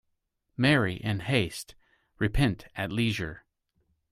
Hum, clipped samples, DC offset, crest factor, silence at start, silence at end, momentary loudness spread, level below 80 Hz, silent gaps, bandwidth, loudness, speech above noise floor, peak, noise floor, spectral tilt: none; under 0.1%; under 0.1%; 22 dB; 0.6 s; 0.75 s; 15 LU; -44 dBFS; none; 15.5 kHz; -28 LUFS; 51 dB; -8 dBFS; -78 dBFS; -6 dB/octave